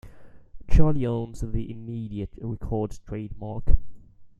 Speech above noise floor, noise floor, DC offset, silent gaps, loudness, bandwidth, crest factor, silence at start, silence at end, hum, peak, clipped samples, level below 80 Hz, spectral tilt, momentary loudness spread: 21 dB; -44 dBFS; under 0.1%; none; -29 LUFS; 7.2 kHz; 20 dB; 0.05 s; 0.1 s; none; -2 dBFS; under 0.1%; -30 dBFS; -9 dB/octave; 11 LU